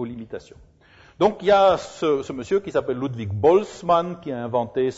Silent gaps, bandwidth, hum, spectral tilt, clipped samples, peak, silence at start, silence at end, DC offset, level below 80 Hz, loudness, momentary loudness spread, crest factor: none; 8 kHz; none; -6.5 dB/octave; under 0.1%; -6 dBFS; 0 s; 0 s; under 0.1%; -54 dBFS; -22 LUFS; 13 LU; 16 dB